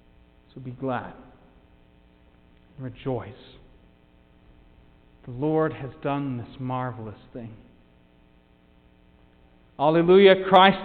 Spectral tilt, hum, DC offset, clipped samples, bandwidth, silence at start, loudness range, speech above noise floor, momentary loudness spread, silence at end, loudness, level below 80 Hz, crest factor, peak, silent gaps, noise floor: -8.5 dB/octave; none; under 0.1%; under 0.1%; 4.6 kHz; 0.55 s; 17 LU; 35 dB; 26 LU; 0 s; -22 LUFS; -56 dBFS; 22 dB; -2 dBFS; none; -58 dBFS